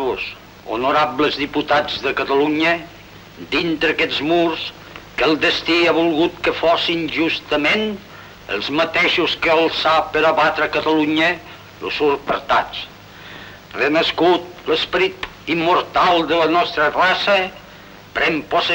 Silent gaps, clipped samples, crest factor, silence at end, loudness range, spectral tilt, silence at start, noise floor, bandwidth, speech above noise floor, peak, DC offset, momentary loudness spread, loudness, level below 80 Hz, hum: none; under 0.1%; 14 dB; 0 s; 3 LU; -4.5 dB/octave; 0 s; -40 dBFS; 16 kHz; 23 dB; -4 dBFS; under 0.1%; 14 LU; -17 LUFS; -48 dBFS; none